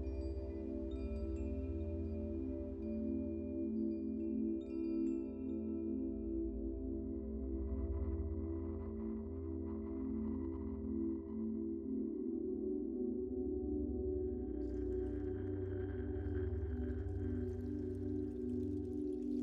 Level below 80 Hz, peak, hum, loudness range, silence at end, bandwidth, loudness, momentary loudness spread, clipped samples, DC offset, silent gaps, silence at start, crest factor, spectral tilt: -48 dBFS; -28 dBFS; none; 2 LU; 0 s; 5 kHz; -42 LUFS; 3 LU; under 0.1%; under 0.1%; none; 0 s; 12 dB; -11 dB/octave